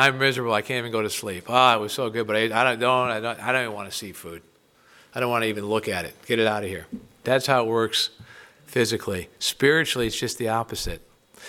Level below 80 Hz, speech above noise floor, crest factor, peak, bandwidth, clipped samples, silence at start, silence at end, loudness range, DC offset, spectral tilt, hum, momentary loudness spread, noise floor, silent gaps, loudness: -50 dBFS; 32 dB; 22 dB; -2 dBFS; 17.5 kHz; under 0.1%; 0 s; 0 s; 5 LU; under 0.1%; -3.5 dB/octave; none; 13 LU; -56 dBFS; none; -23 LUFS